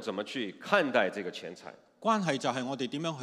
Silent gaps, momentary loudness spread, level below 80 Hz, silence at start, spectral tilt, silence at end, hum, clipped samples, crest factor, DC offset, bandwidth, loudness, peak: none; 15 LU; -86 dBFS; 0 s; -4.5 dB/octave; 0 s; none; under 0.1%; 24 dB; under 0.1%; 13.5 kHz; -31 LUFS; -8 dBFS